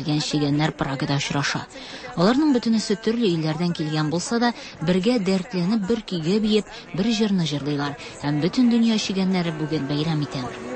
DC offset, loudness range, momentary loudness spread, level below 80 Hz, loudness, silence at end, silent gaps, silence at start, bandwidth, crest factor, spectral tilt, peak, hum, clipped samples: under 0.1%; 1 LU; 7 LU; -52 dBFS; -23 LUFS; 0 s; none; 0 s; 8.8 kHz; 14 dB; -5.5 dB/octave; -8 dBFS; none; under 0.1%